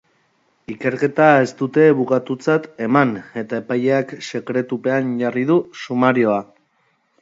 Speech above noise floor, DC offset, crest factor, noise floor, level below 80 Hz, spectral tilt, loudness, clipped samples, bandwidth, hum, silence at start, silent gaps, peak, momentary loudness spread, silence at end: 46 dB; under 0.1%; 18 dB; -64 dBFS; -66 dBFS; -7 dB/octave; -18 LUFS; under 0.1%; 7.8 kHz; none; 0.7 s; none; 0 dBFS; 11 LU; 0.8 s